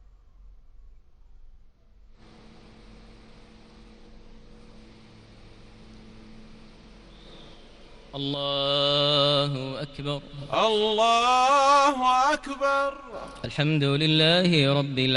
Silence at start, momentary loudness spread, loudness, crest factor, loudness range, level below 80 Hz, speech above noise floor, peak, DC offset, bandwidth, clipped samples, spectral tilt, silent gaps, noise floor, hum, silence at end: 0.45 s; 14 LU; -23 LUFS; 18 dB; 8 LU; -52 dBFS; 30 dB; -8 dBFS; under 0.1%; 11.5 kHz; under 0.1%; -5 dB/octave; none; -53 dBFS; none; 0 s